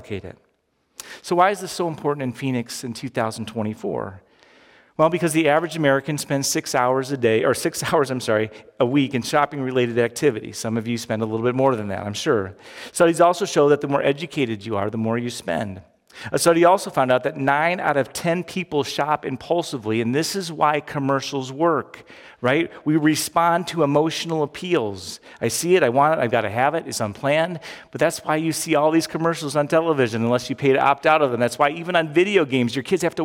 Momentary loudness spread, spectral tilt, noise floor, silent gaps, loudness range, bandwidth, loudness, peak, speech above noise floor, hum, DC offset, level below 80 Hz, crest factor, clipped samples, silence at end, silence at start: 10 LU; -5 dB/octave; -67 dBFS; none; 4 LU; 17.5 kHz; -21 LUFS; -4 dBFS; 47 dB; none; under 0.1%; -62 dBFS; 18 dB; under 0.1%; 0 s; 0 s